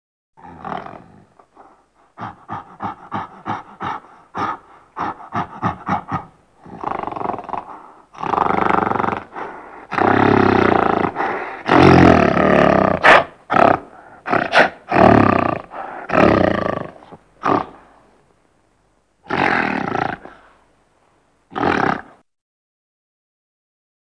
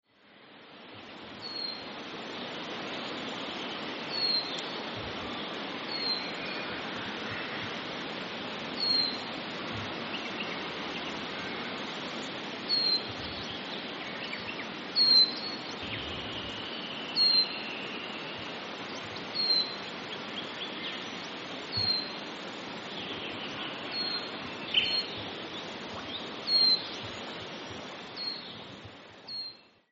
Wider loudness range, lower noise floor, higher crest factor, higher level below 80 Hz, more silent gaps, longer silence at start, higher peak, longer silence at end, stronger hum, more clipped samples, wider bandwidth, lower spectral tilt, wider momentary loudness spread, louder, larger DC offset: first, 15 LU vs 7 LU; first, -61 dBFS vs -57 dBFS; about the same, 18 dB vs 22 dB; first, -42 dBFS vs -66 dBFS; neither; first, 0.45 s vs 0.25 s; first, 0 dBFS vs -12 dBFS; first, 2.1 s vs 0.25 s; neither; neither; first, 10.5 kHz vs 7.6 kHz; first, -7 dB/octave vs 0 dB/octave; first, 21 LU vs 14 LU; first, -16 LUFS vs -31 LUFS; neither